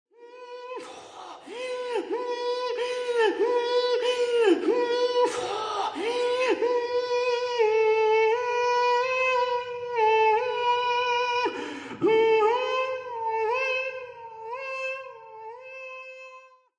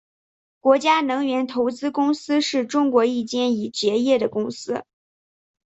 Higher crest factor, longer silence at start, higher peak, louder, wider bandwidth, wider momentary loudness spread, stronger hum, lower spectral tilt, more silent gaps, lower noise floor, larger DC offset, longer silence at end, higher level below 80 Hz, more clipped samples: about the same, 16 dB vs 18 dB; second, 0.2 s vs 0.65 s; second, -10 dBFS vs -4 dBFS; second, -25 LUFS vs -21 LUFS; first, 10 kHz vs 8.2 kHz; first, 19 LU vs 8 LU; neither; about the same, -3 dB/octave vs -4 dB/octave; neither; second, -51 dBFS vs under -90 dBFS; neither; second, 0.3 s vs 0.95 s; about the same, -72 dBFS vs -68 dBFS; neither